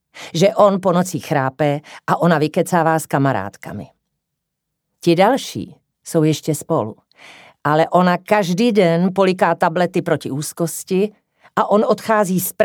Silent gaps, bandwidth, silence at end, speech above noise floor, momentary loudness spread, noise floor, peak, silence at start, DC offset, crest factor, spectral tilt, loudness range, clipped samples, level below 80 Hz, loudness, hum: none; 19.5 kHz; 0 s; 61 dB; 11 LU; -78 dBFS; 0 dBFS; 0.15 s; under 0.1%; 18 dB; -5.5 dB/octave; 4 LU; under 0.1%; -66 dBFS; -17 LUFS; none